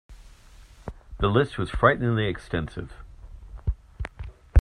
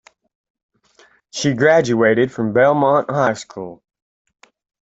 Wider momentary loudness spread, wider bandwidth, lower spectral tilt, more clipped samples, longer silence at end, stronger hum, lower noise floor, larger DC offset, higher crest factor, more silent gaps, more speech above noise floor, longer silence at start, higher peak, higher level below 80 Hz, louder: first, 22 LU vs 18 LU; first, 10.5 kHz vs 8 kHz; first, -7.5 dB/octave vs -5.5 dB/octave; neither; second, 0 s vs 1.15 s; neither; second, -49 dBFS vs -54 dBFS; neither; first, 22 dB vs 16 dB; neither; second, 25 dB vs 38 dB; second, 0.1 s vs 1.35 s; about the same, -4 dBFS vs -2 dBFS; first, -32 dBFS vs -58 dBFS; second, -26 LUFS vs -16 LUFS